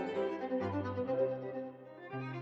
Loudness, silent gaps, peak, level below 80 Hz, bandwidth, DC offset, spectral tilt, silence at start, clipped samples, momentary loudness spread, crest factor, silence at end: -38 LUFS; none; -22 dBFS; -78 dBFS; 7.4 kHz; under 0.1%; -8.5 dB/octave; 0 s; under 0.1%; 11 LU; 14 dB; 0 s